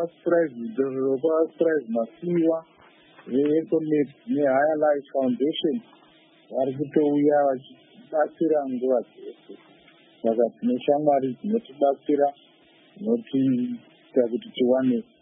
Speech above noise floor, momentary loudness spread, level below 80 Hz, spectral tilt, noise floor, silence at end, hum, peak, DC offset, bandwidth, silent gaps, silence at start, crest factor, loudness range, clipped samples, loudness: 33 dB; 7 LU; -80 dBFS; -11 dB/octave; -56 dBFS; 0.2 s; none; -8 dBFS; under 0.1%; 3.8 kHz; none; 0 s; 18 dB; 2 LU; under 0.1%; -24 LUFS